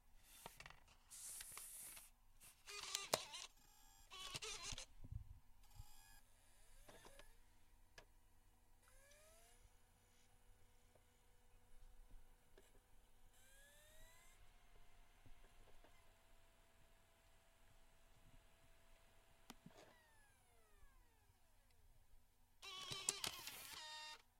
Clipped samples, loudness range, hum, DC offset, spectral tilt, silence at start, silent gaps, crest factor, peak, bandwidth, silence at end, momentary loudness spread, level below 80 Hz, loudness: under 0.1%; 18 LU; none; under 0.1%; -1 dB/octave; 0 s; none; 38 dB; -20 dBFS; 16 kHz; 0 s; 23 LU; -68 dBFS; -51 LUFS